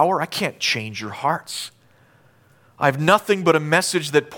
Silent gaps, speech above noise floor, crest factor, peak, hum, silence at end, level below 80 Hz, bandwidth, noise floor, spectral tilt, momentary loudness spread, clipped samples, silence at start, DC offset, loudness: none; 35 dB; 20 dB; -2 dBFS; none; 0 s; -66 dBFS; 19 kHz; -55 dBFS; -4 dB/octave; 13 LU; under 0.1%; 0 s; under 0.1%; -20 LUFS